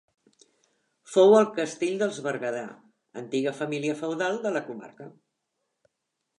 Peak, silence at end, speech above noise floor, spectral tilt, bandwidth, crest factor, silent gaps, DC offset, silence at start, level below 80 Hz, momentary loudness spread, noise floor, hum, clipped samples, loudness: -6 dBFS; 1.3 s; 56 dB; -5 dB/octave; 11 kHz; 22 dB; none; under 0.1%; 1.1 s; -82 dBFS; 23 LU; -82 dBFS; none; under 0.1%; -25 LUFS